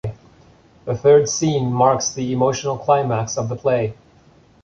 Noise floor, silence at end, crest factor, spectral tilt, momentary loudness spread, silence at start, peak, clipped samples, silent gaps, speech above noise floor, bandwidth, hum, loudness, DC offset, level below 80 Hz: -51 dBFS; 0.7 s; 18 dB; -5 dB/octave; 12 LU; 0.05 s; -2 dBFS; under 0.1%; none; 33 dB; 7.6 kHz; none; -18 LUFS; under 0.1%; -50 dBFS